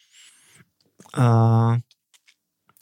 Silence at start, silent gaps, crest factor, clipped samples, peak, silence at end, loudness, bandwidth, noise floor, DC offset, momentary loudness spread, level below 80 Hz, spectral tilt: 1.15 s; none; 16 dB; under 0.1%; -8 dBFS; 1 s; -20 LUFS; 9.4 kHz; -64 dBFS; under 0.1%; 11 LU; -66 dBFS; -8.5 dB/octave